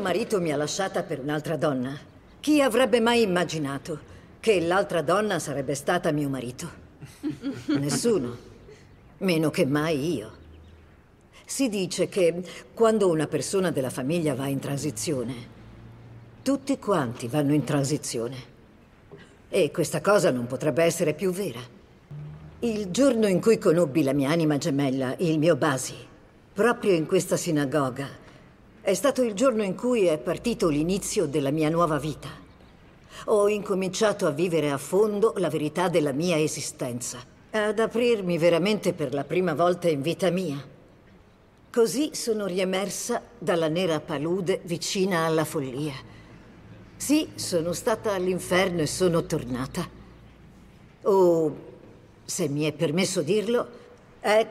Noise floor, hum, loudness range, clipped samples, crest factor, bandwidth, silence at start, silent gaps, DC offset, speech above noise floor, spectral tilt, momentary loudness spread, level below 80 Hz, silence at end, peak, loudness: -55 dBFS; none; 4 LU; under 0.1%; 18 dB; 16 kHz; 0 s; none; under 0.1%; 31 dB; -5 dB/octave; 12 LU; -56 dBFS; 0 s; -8 dBFS; -25 LUFS